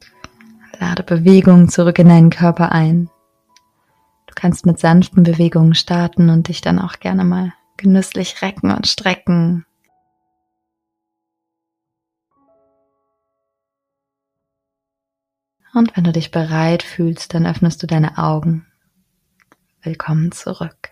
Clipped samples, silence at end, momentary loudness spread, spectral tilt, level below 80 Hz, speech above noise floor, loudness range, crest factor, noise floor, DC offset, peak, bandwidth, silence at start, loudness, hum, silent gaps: 0.2%; 0.25 s; 13 LU; -7 dB/octave; -48 dBFS; 70 dB; 10 LU; 16 dB; -82 dBFS; under 0.1%; 0 dBFS; 10.5 kHz; 0.8 s; -14 LUFS; none; none